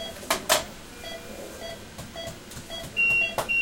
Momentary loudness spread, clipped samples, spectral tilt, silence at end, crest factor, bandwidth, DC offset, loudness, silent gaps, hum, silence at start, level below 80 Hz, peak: 19 LU; under 0.1%; -1.5 dB/octave; 0 s; 26 dB; 17 kHz; under 0.1%; -24 LUFS; none; none; 0 s; -52 dBFS; -4 dBFS